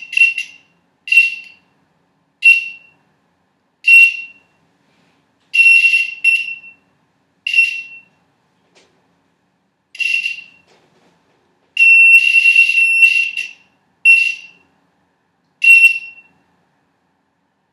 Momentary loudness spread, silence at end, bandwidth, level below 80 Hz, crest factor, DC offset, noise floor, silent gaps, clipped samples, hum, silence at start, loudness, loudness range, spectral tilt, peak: 20 LU; 1.65 s; 14.5 kHz; -88 dBFS; 16 dB; under 0.1%; -65 dBFS; none; under 0.1%; none; 0.1 s; -9 LUFS; 12 LU; 3.5 dB/octave; 0 dBFS